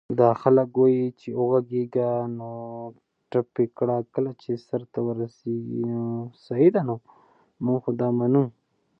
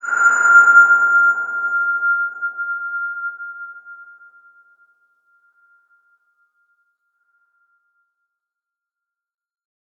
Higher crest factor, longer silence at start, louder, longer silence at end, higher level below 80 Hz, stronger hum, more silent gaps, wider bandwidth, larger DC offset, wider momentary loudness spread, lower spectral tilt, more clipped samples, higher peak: about the same, 20 dB vs 18 dB; about the same, 0.1 s vs 0.05 s; second, -25 LUFS vs -14 LUFS; second, 0.5 s vs 5.95 s; first, -70 dBFS vs -88 dBFS; neither; neither; second, 5.8 kHz vs 7.6 kHz; neither; second, 12 LU vs 22 LU; first, -11 dB/octave vs -0.5 dB/octave; neither; about the same, -4 dBFS vs -2 dBFS